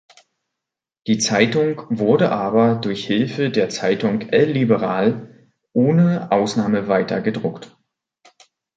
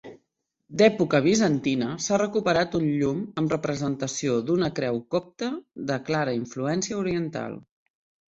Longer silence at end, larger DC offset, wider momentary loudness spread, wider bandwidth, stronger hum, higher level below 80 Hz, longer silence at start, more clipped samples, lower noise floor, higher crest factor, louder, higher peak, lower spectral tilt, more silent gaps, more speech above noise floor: first, 1.1 s vs 0.7 s; neither; second, 7 LU vs 11 LU; first, 9.2 kHz vs 8.2 kHz; neither; about the same, -60 dBFS vs -60 dBFS; first, 1.05 s vs 0.05 s; neither; first, -85 dBFS vs -77 dBFS; about the same, 18 dB vs 20 dB; first, -19 LUFS vs -25 LUFS; first, 0 dBFS vs -4 dBFS; about the same, -5.5 dB/octave vs -5 dB/octave; neither; first, 67 dB vs 53 dB